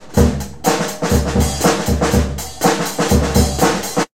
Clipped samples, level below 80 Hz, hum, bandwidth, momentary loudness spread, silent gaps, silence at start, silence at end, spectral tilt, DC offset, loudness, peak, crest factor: under 0.1%; -24 dBFS; none; 16.5 kHz; 4 LU; none; 0 s; 0 s; -5 dB/octave; 1%; -16 LUFS; 0 dBFS; 16 dB